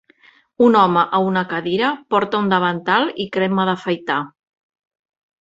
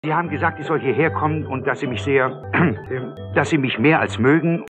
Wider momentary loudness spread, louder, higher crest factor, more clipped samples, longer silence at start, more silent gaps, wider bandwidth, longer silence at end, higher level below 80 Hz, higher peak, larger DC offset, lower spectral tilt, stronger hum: about the same, 8 LU vs 7 LU; about the same, -18 LUFS vs -20 LUFS; about the same, 18 dB vs 16 dB; neither; first, 0.6 s vs 0.05 s; neither; second, 7.8 kHz vs 9.2 kHz; first, 1.15 s vs 0 s; about the same, -62 dBFS vs -58 dBFS; about the same, -2 dBFS vs -4 dBFS; neither; about the same, -7 dB/octave vs -7 dB/octave; neither